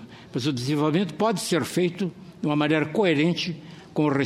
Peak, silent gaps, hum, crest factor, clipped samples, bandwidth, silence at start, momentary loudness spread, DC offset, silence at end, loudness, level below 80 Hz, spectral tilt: -8 dBFS; none; none; 16 dB; under 0.1%; 15 kHz; 0 s; 10 LU; under 0.1%; 0 s; -25 LUFS; -64 dBFS; -5.5 dB/octave